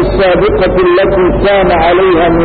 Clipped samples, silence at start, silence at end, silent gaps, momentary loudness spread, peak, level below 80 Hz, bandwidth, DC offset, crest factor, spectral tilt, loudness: under 0.1%; 0 s; 0 s; none; 2 LU; -2 dBFS; -22 dBFS; 4.7 kHz; under 0.1%; 6 dB; -12.5 dB/octave; -8 LUFS